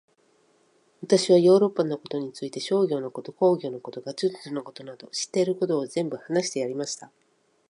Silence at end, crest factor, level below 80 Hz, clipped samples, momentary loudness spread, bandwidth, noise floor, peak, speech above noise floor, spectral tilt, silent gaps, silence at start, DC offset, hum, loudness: 0.65 s; 20 dB; -78 dBFS; under 0.1%; 16 LU; 11 kHz; -64 dBFS; -6 dBFS; 39 dB; -5 dB/octave; none; 1 s; under 0.1%; none; -25 LUFS